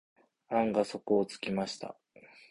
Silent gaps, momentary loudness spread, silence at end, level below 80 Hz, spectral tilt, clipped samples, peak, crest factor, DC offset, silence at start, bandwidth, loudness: none; 10 LU; 0.25 s; -70 dBFS; -5.5 dB/octave; under 0.1%; -14 dBFS; 20 dB; under 0.1%; 0.5 s; 11.5 kHz; -32 LUFS